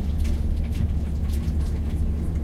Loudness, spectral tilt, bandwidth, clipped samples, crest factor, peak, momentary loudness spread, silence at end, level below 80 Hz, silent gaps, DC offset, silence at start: -26 LUFS; -8 dB/octave; 12.5 kHz; under 0.1%; 10 dB; -12 dBFS; 1 LU; 0 s; -24 dBFS; none; under 0.1%; 0 s